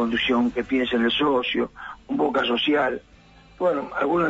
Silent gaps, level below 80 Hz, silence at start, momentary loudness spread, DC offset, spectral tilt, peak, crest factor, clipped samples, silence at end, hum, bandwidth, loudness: none; -52 dBFS; 0 s; 8 LU; under 0.1%; -6 dB/octave; -10 dBFS; 12 dB; under 0.1%; 0 s; none; 7.8 kHz; -23 LUFS